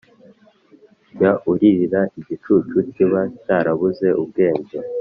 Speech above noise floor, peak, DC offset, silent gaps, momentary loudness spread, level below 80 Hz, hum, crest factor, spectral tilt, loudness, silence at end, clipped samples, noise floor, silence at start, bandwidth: 34 dB; -2 dBFS; under 0.1%; none; 7 LU; -58 dBFS; none; 18 dB; -7.5 dB/octave; -18 LUFS; 0 s; under 0.1%; -52 dBFS; 1.15 s; 5.4 kHz